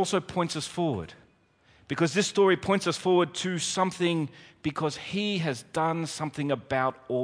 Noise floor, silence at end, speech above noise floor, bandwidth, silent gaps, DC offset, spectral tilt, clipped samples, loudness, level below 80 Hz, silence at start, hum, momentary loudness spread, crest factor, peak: -63 dBFS; 0 s; 35 dB; 10.5 kHz; none; under 0.1%; -4.5 dB/octave; under 0.1%; -28 LUFS; -62 dBFS; 0 s; none; 9 LU; 18 dB; -10 dBFS